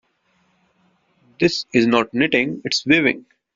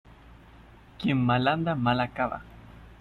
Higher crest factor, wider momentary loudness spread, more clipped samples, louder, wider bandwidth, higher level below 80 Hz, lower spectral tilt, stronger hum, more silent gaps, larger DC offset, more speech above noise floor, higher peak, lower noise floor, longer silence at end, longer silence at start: about the same, 20 dB vs 16 dB; second, 5 LU vs 8 LU; neither; first, -18 LUFS vs -27 LUFS; first, 7.8 kHz vs 5.8 kHz; second, -58 dBFS vs -52 dBFS; second, -4.5 dB/octave vs -8.5 dB/octave; neither; neither; neither; first, 46 dB vs 26 dB; first, -2 dBFS vs -12 dBFS; first, -64 dBFS vs -52 dBFS; first, 0.35 s vs 0.05 s; first, 1.4 s vs 0.3 s